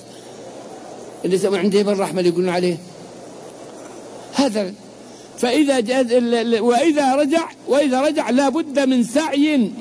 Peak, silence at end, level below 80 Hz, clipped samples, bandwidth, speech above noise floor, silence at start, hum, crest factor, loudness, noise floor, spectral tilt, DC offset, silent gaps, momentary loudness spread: -6 dBFS; 0 s; -66 dBFS; under 0.1%; 11 kHz; 22 dB; 0 s; none; 14 dB; -18 LUFS; -39 dBFS; -5 dB/octave; under 0.1%; none; 21 LU